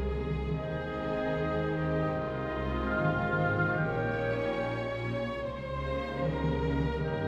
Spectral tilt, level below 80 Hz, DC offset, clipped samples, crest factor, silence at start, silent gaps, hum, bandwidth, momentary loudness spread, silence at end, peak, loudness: -8.5 dB/octave; -42 dBFS; under 0.1%; under 0.1%; 14 dB; 0 s; none; none; 7.6 kHz; 5 LU; 0 s; -18 dBFS; -32 LUFS